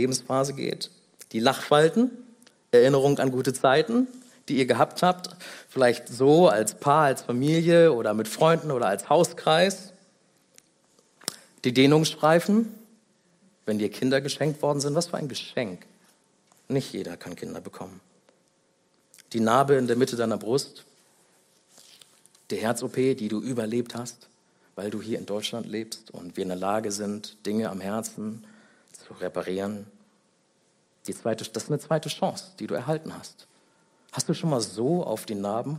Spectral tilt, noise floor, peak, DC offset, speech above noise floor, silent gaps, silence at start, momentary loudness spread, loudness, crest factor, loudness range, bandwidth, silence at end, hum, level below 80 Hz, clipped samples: -5 dB/octave; -67 dBFS; -4 dBFS; under 0.1%; 42 dB; none; 0 s; 17 LU; -25 LUFS; 22 dB; 12 LU; 16 kHz; 0 s; none; -72 dBFS; under 0.1%